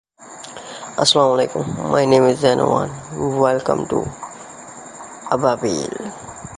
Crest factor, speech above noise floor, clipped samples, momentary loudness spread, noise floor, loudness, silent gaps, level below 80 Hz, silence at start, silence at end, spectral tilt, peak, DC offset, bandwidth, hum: 18 dB; 21 dB; under 0.1%; 21 LU; -38 dBFS; -18 LUFS; none; -50 dBFS; 0.2 s; 0 s; -4.5 dB/octave; 0 dBFS; under 0.1%; 11.5 kHz; none